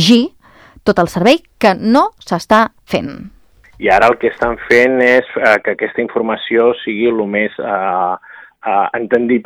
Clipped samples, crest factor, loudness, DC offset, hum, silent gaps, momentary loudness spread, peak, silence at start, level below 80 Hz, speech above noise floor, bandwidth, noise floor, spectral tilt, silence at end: 0.4%; 14 dB; -14 LUFS; under 0.1%; none; none; 9 LU; 0 dBFS; 0 s; -44 dBFS; 30 dB; 15.5 kHz; -44 dBFS; -5 dB/octave; 0.05 s